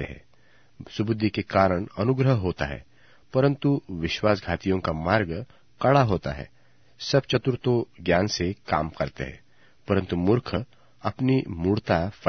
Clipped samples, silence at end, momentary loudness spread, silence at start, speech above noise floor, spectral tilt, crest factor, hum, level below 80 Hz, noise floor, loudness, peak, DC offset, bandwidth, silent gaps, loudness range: under 0.1%; 0 s; 13 LU; 0 s; 36 dB; -6.5 dB/octave; 22 dB; none; -48 dBFS; -61 dBFS; -25 LUFS; -4 dBFS; 0.2%; 6.6 kHz; none; 2 LU